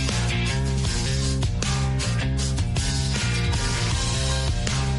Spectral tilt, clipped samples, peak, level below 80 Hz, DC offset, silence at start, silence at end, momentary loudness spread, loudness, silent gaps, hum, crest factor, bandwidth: -4 dB/octave; under 0.1%; -6 dBFS; -28 dBFS; under 0.1%; 0 s; 0 s; 1 LU; -24 LUFS; none; none; 16 dB; 11.5 kHz